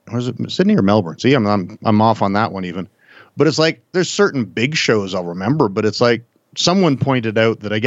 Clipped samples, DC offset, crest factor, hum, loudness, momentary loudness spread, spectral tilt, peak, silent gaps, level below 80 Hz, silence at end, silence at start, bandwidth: under 0.1%; under 0.1%; 16 dB; none; -17 LUFS; 8 LU; -5.5 dB/octave; -2 dBFS; none; -64 dBFS; 0 s; 0.05 s; 8 kHz